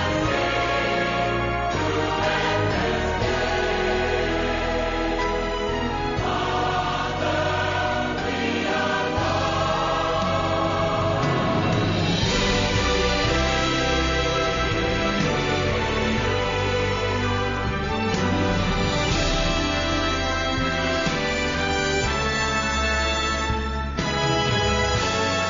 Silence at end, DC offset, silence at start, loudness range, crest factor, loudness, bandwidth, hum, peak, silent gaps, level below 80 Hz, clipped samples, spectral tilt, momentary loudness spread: 0 s; under 0.1%; 0 s; 2 LU; 14 dB; -23 LUFS; 7.6 kHz; none; -8 dBFS; none; -34 dBFS; under 0.1%; -3.5 dB/octave; 3 LU